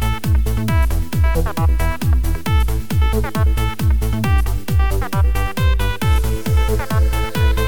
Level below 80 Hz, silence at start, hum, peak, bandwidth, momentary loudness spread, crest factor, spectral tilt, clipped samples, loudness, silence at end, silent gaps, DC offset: -18 dBFS; 0 s; none; -4 dBFS; over 20 kHz; 1 LU; 12 dB; -6 dB/octave; under 0.1%; -18 LUFS; 0 s; none; 5%